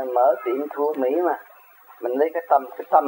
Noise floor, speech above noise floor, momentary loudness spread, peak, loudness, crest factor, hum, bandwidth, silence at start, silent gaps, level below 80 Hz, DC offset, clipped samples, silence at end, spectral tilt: -49 dBFS; 28 dB; 8 LU; -2 dBFS; -23 LUFS; 20 dB; none; 16.5 kHz; 0 s; none; -90 dBFS; under 0.1%; under 0.1%; 0 s; -6 dB/octave